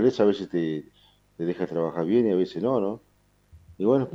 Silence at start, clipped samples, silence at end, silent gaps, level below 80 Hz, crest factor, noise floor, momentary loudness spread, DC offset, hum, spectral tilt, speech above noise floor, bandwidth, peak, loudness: 0 s; under 0.1%; 0 s; none; -62 dBFS; 16 dB; -56 dBFS; 10 LU; under 0.1%; 50 Hz at -55 dBFS; -8 dB/octave; 31 dB; 7.6 kHz; -8 dBFS; -26 LUFS